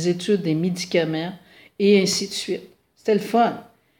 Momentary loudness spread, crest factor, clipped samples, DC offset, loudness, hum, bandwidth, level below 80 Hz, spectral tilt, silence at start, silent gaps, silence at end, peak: 12 LU; 18 dB; under 0.1%; under 0.1%; -22 LUFS; none; 17 kHz; -68 dBFS; -5 dB/octave; 0 s; none; 0.35 s; -4 dBFS